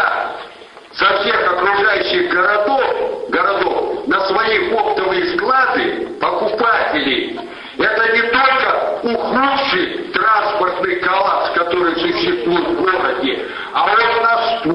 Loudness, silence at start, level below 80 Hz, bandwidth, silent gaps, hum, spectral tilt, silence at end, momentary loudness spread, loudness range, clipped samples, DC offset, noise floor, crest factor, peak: -15 LUFS; 0 s; -50 dBFS; 10.5 kHz; none; none; -5.5 dB/octave; 0 s; 7 LU; 1 LU; under 0.1%; under 0.1%; -38 dBFS; 14 dB; -2 dBFS